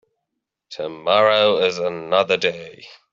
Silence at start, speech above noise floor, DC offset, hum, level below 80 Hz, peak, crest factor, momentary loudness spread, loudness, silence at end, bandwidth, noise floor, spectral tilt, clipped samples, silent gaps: 0.7 s; 61 dB; under 0.1%; none; -68 dBFS; -2 dBFS; 18 dB; 19 LU; -18 LUFS; 0.25 s; 7.6 kHz; -80 dBFS; -4 dB/octave; under 0.1%; none